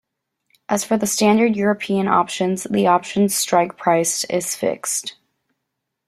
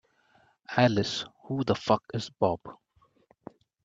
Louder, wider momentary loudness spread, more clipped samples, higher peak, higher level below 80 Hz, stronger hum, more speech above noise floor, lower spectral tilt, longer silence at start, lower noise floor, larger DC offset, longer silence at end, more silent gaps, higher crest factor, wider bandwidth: first, -19 LUFS vs -28 LUFS; second, 7 LU vs 12 LU; neither; first, -2 dBFS vs -6 dBFS; about the same, -62 dBFS vs -66 dBFS; neither; first, 60 dB vs 38 dB; second, -4 dB/octave vs -6 dB/octave; about the same, 0.7 s vs 0.7 s; first, -78 dBFS vs -65 dBFS; neither; second, 0.95 s vs 1.1 s; neither; second, 18 dB vs 24 dB; first, 15 kHz vs 7.8 kHz